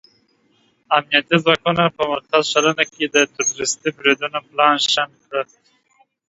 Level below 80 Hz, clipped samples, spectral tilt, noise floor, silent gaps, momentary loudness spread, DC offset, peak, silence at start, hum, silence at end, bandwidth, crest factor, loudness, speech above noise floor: -60 dBFS; under 0.1%; -2.5 dB/octave; -61 dBFS; none; 9 LU; under 0.1%; 0 dBFS; 0.9 s; none; 0.85 s; 8 kHz; 20 dB; -18 LUFS; 42 dB